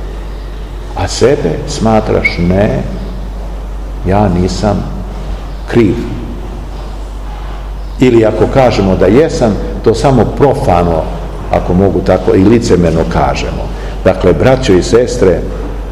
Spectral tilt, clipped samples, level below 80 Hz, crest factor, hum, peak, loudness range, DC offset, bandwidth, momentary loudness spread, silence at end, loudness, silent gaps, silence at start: -6.5 dB/octave; 2%; -20 dBFS; 10 dB; none; 0 dBFS; 5 LU; 0.8%; 12.5 kHz; 16 LU; 0 s; -10 LUFS; none; 0 s